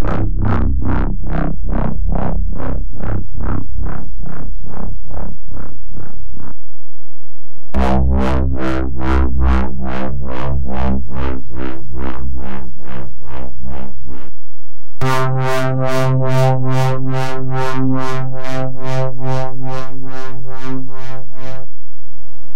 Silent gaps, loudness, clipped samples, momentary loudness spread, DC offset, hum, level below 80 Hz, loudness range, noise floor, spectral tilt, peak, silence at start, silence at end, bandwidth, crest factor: none; -21 LUFS; under 0.1%; 17 LU; 50%; none; -24 dBFS; 12 LU; -46 dBFS; -7.5 dB/octave; 0 dBFS; 0 s; 0 s; 15 kHz; 14 dB